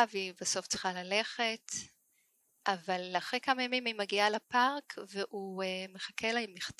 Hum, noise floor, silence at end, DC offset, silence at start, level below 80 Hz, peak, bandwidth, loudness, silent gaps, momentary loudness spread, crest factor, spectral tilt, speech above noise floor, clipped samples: none; -74 dBFS; 0.1 s; under 0.1%; 0 s; -76 dBFS; -12 dBFS; 15 kHz; -34 LUFS; none; 10 LU; 22 dB; -2 dB/octave; 39 dB; under 0.1%